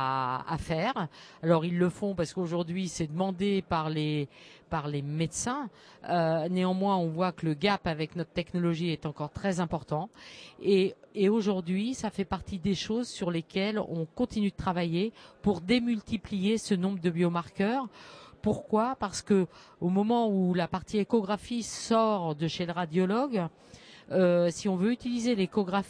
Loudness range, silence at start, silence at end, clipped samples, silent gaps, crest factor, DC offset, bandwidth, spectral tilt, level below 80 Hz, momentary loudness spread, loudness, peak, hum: 3 LU; 0 s; 0 s; under 0.1%; none; 18 dB; under 0.1%; 10.5 kHz; -6 dB/octave; -56 dBFS; 8 LU; -30 LUFS; -12 dBFS; none